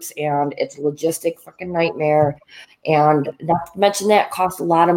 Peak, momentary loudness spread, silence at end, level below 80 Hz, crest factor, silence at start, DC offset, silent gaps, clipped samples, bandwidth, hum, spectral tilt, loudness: -2 dBFS; 10 LU; 0 s; -58 dBFS; 18 dB; 0 s; under 0.1%; none; under 0.1%; 17 kHz; none; -5 dB/octave; -19 LUFS